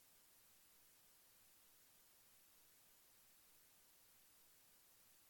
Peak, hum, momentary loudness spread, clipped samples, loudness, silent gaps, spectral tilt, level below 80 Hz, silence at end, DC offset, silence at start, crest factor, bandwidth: -58 dBFS; none; 0 LU; under 0.1%; -68 LUFS; none; -0.5 dB/octave; under -90 dBFS; 0 s; under 0.1%; 0 s; 14 dB; 18 kHz